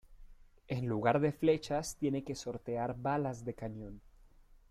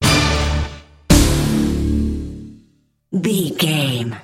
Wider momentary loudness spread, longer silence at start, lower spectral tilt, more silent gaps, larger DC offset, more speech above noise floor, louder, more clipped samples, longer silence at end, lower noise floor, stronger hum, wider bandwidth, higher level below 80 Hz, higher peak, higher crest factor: about the same, 13 LU vs 13 LU; about the same, 0.1 s vs 0 s; first, -6 dB/octave vs -4.5 dB/octave; neither; neither; second, 26 dB vs 39 dB; second, -35 LUFS vs -18 LUFS; neither; first, 0.45 s vs 0 s; about the same, -61 dBFS vs -58 dBFS; neither; about the same, 15.5 kHz vs 16.5 kHz; second, -58 dBFS vs -24 dBFS; second, -16 dBFS vs 0 dBFS; about the same, 20 dB vs 18 dB